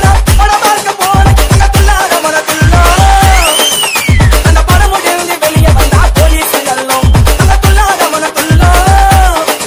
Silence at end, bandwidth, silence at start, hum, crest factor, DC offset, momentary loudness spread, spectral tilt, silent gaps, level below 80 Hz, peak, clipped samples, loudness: 0 s; 16.5 kHz; 0 s; none; 6 dB; under 0.1%; 4 LU; -4 dB/octave; none; -10 dBFS; 0 dBFS; 6%; -7 LUFS